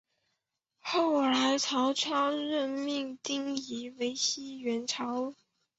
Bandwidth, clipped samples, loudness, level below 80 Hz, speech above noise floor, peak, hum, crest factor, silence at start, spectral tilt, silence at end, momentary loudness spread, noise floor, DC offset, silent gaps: 8.2 kHz; under 0.1%; -31 LUFS; -78 dBFS; 52 dB; -16 dBFS; none; 16 dB; 0.85 s; -1.5 dB/octave; 0.45 s; 9 LU; -83 dBFS; under 0.1%; none